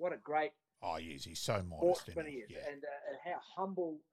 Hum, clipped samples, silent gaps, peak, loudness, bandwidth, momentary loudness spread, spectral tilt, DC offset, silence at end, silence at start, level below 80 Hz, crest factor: none; under 0.1%; none; -20 dBFS; -40 LUFS; 15 kHz; 11 LU; -5 dB/octave; under 0.1%; 0.15 s; 0 s; -66 dBFS; 20 dB